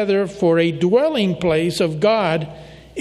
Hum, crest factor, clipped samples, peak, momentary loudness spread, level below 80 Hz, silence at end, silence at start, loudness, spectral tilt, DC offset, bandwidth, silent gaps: none; 14 dB; under 0.1%; -4 dBFS; 6 LU; -50 dBFS; 0 s; 0 s; -18 LUFS; -6 dB/octave; under 0.1%; 13 kHz; none